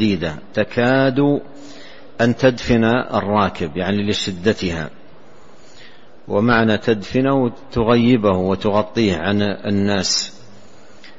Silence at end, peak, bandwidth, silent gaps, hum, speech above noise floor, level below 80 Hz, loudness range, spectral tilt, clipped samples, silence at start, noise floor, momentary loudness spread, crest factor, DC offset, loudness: 0.1 s; -2 dBFS; 8 kHz; none; none; 29 dB; -44 dBFS; 4 LU; -5.5 dB/octave; under 0.1%; 0 s; -46 dBFS; 8 LU; 16 dB; 2%; -18 LUFS